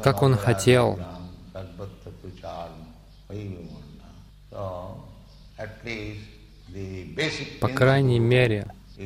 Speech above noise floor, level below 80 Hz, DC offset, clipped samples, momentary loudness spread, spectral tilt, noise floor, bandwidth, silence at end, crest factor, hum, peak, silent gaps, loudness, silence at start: 25 dB; -48 dBFS; under 0.1%; under 0.1%; 23 LU; -6 dB/octave; -47 dBFS; 15.5 kHz; 0 s; 20 dB; none; -6 dBFS; none; -23 LUFS; 0 s